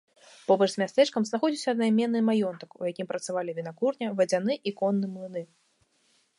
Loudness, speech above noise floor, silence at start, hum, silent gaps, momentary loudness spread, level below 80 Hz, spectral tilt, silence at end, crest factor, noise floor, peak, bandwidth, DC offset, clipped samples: -27 LUFS; 42 dB; 0.5 s; none; none; 11 LU; -82 dBFS; -5.5 dB/octave; 0.95 s; 18 dB; -69 dBFS; -8 dBFS; 11.5 kHz; under 0.1%; under 0.1%